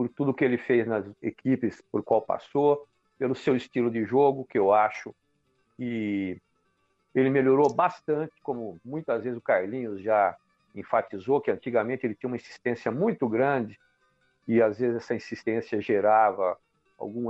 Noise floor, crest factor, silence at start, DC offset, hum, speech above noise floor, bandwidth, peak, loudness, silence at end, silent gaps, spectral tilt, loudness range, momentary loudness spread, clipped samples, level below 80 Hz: -72 dBFS; 16 dB; 0 s; under 0.1%; none; 46 dB; 7.8 kHz; -10 dBFS; -27 LUFS; 0 s; none; -8 dB/octave; 3 LU; 13 LU; under 0.1%; -70 dBFS